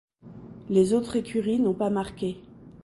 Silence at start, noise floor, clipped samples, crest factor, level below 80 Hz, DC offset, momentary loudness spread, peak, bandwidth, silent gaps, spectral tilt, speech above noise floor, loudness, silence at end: 0.25 s; -45 dBFS; under 0.1%; 18 dB; -56 dBFS; under 0.1%; 21 LU; -10 dBFS; 11.5 kHz; none; -7 dB/octave; 21 dB; -26 LUFS; 0.15 s